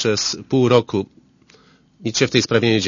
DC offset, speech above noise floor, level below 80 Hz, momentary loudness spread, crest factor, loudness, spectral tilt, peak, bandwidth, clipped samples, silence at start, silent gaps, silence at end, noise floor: under 0.1%; 35 dB; -56 dBFS; 11 LU; 20 dB; -18 LUFS; -4.5 dB/octave; 0 dBFS; 7.4 kHz; under 0.1%; 0 s; none; 0 s; -52 dBFS